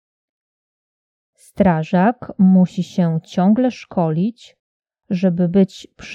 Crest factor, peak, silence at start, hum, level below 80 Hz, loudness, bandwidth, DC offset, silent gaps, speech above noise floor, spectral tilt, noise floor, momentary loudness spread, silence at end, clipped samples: 16 dB; -2 dBFS; 1.6 s; none; -52 dBFS; -17 LUFS; 7.6 kHz; under 0.1%; 4.59-4.80 s; over 73 dB; -8.5 dB/octave; under -90 dBFS; 7 LU; 0 s; under 0.1%